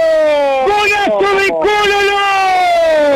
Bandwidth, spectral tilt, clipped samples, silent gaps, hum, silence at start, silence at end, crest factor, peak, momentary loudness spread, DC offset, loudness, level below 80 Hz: 15.5 kHz; -2.5 dB/octave; under 0.1%; none; none; 0 s; 0 s; 8 dB; -4 dBFS; 1 LU; under 0.1%; -11 LUFS; -42 dBFS